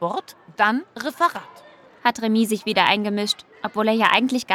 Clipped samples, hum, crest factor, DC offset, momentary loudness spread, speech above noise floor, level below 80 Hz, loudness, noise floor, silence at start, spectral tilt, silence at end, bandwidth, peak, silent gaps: under 0.1%; none; 20 dB; under 0.1%; 12 LU; 27 dB; -70 dBFS; -21 LUFS; -48 dBFS; 0 s; -4 dB/octave; 0 s; 16.5 kHz; -2 dBFS; none